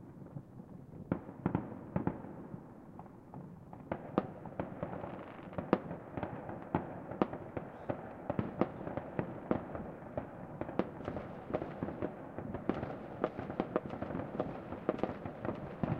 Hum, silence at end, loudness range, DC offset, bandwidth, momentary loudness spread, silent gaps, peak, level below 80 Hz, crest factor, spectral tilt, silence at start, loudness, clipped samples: none; 0 s; 3 LU; under 0.1%; 7.2 kHz; 12 LU; none; -10 dBFS; -62 dBFS; 30 dB; -9.5 dB/octave; 0 s; -41 LUFS; under 0.1%